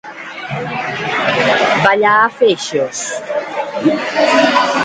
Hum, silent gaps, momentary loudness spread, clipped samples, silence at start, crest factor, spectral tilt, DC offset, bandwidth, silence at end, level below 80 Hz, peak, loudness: none; none; 11 LU; under 0.1%; 0.05 s; 14 dB; -3.5 dB/octave; under 0.1%; 9.6 kHz; 0 s; -56 dBFS; 0 dBFS; -14 LUFS